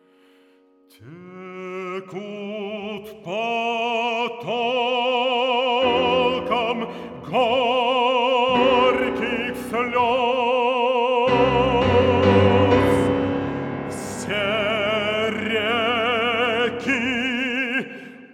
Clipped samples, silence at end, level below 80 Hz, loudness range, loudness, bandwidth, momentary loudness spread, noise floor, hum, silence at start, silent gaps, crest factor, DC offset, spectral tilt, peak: under 0.1%; 0.05 s; -48 dBFS; 8 LU; -20 LUFS; 13.5 kHz; 14 LU; -56 dBFS; none; 1 s; none; 16 dB; under 0.1%; -5.5 dB/octave; -4 dBFS